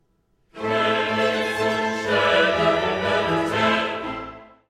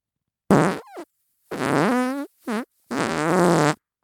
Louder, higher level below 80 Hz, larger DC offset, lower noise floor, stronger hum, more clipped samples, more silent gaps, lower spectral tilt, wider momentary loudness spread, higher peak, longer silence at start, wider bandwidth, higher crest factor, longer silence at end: about the same, -21 LUFS vs -22 LUFS; first, -52 dBFS vs -60 dBFS; neither; second, -65 dBFS vs -83 dBFS; neither; neither; neither; about the same, -4.5 dB/octave vs -5.5 dB/octave; second, 11 LU vs 14 LU; second, -6 dBFS vs -2 dBFS; about the same, 0.55 s vs 0.5 s; second, 15 kHz vs 18.5 kHz; second, 16 dB vs 22 dB; about the same, 0.25 s vs 0.3 s